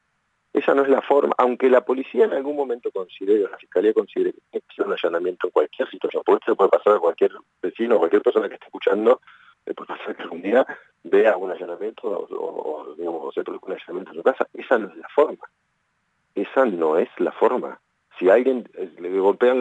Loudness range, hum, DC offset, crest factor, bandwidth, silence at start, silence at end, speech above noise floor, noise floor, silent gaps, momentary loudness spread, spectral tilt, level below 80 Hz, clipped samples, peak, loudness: 5 LU; none; under 0.1%; 18 dB; 8 kHz; 0.55 s; 0 s; 50 dB; -71 dBFS; none; 14 LU; -6.5 dB/octave; -84 dBFS; under 0.1%; -4 dBFS; -22 LUFS